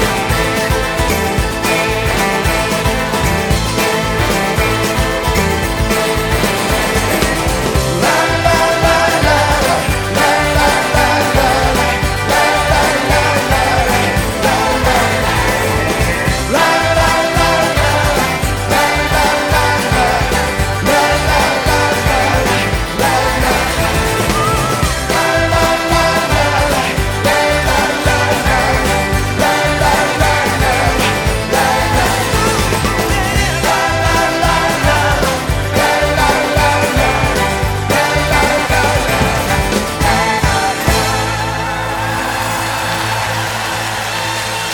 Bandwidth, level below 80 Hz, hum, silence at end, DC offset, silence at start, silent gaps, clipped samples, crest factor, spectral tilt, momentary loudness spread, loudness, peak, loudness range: 19 kHz; -24 dBFS; none; 0 s; under 0.1%; 0 s; none; under 0.1%; 14 dB; -4 dB/octave; 4 LU; -13 LUFS; 0 dBFS; 2 LU